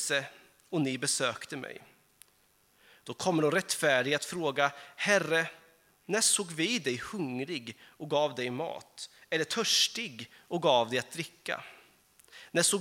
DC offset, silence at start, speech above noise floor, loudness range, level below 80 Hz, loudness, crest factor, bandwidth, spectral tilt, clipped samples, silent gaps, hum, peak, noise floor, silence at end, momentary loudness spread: under 0.1%; 0 s; 37 dB; 4 LU; -76 dBFS; -30 LUFS; 22 dB; 17 kHz; -2.5 dB/octave; under 0.1%; none; none; -10 dBFS; -68 dBFS; 0 s; 18 LU